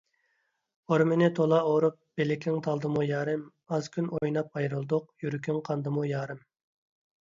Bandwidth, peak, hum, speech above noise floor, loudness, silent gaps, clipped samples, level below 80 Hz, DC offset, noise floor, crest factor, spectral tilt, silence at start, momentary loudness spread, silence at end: 7.6 kHz; -12 dBFS; none; 48 dB; -29 LUFS; none; under 0.1%; -70 dBFS; under 0.1%; -76 dBFS; 18 dB; -7.5 dB/octave; 0.9 s; 10 LU; 0.85 s